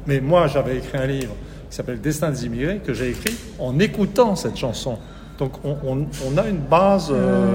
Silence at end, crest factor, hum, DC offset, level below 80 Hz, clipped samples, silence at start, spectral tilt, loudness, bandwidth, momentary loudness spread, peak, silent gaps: 0 s; 20 dB; none; under 0.1%; -38 dBFS; under 0.1%; 0 s; -6 dB/octave; -21 LUFS; 16.5 kHz; 12 LU; -2 dBFS; none